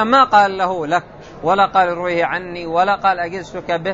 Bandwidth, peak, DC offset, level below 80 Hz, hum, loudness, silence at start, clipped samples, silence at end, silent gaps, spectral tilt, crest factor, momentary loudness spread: 7.8 kHz; 0 dBFS; under 0.1%; -50 dBFS; none; -17 LUFS; 0 s; under 0.1%; 0 s; none; -5 dB/octave; 16 dB; 11 LU